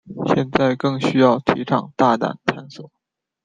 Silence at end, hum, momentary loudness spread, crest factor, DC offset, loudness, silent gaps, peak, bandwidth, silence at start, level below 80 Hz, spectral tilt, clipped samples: 0.6 s; none; 9 LU; 18 dB; under 0.1%; -19 LUFS; none; 0 dBFS; 9.2 kHz; 0.05 s; -54 dBFS; -7 dB/octave; under 0.1%